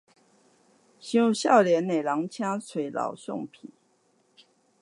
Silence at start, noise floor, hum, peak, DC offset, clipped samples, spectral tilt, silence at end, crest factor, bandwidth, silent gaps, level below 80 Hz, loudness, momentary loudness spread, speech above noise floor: 1.05 s; -67 dBFS; none; -6 dBFS; under 0.1%; under 0.1%; -5 dB/octave; 1.15 s; 22 dB; 11.5 kHz; none; -82 dBFS; -26 LUFS; 16 LU; 42 dB